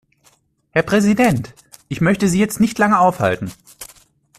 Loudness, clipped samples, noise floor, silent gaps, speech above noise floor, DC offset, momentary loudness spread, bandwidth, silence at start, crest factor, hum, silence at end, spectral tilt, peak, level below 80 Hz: -16 LUFS; under 0.1%; -57 dBFS; none; 42 dB; under 0.1%; 22 LU; 14.5 kHz; 0.75 s; 16 dB; none; 0.55 s; -6 dB/octave; -2 dBFS; -48 dBFS